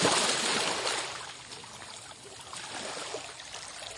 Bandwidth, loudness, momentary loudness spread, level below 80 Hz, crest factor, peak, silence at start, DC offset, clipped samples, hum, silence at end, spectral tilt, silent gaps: 11.5 kHz; -31 LUFS; 17 LU; -68 dBFS; 22 dB; -12 dBFS; 0 s; under 0.1%; under 0.1%; none; 0 s; -1 dB/octave; none